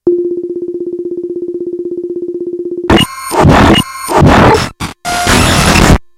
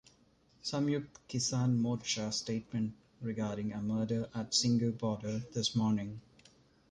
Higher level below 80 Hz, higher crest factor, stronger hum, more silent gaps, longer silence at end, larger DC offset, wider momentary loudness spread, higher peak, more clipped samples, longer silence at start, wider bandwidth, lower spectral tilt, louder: first, -22 dBFS vs -66 dBFS; second, 10 dB vs 18 dB; neither; neither; second, 0.15 s vs 0.7 s; neither; first, 13 LU vs 9 LU; first, 0 dBFS vs -16 dBFS; first, 2% vs under 0.1%; second, 0.05 s vs 0.65 s; first, 17 kHz vs 11 kHz; about the same, -5 dB/octave vs -5 dB/octave; first, -10 LUFS vs -35 LUFS